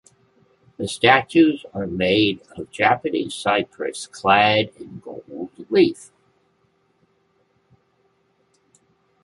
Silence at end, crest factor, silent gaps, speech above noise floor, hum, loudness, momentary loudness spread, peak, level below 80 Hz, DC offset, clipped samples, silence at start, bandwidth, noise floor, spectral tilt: 3.2 s; 20 dB; none; 45 dB; none; -19 LUFS; 20 LU; -2 dBFS; -56 dBFS; under 0.1%; under 0.1%; 0.8 s; 11.5 kHz; -65 dBFS; -4.5 dB/octave